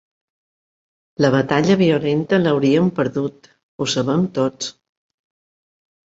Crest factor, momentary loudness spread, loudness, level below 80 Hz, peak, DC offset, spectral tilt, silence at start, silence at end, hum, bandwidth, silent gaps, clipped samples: 18 dB; 11 LU; -18 LUFS; -56 dBFS; -2 dBFS; under 0.1%; -6 dB/octave; 1.2 s; 1.4 s; none; 8 kHz; 3.63-3.78 s; under 0.1%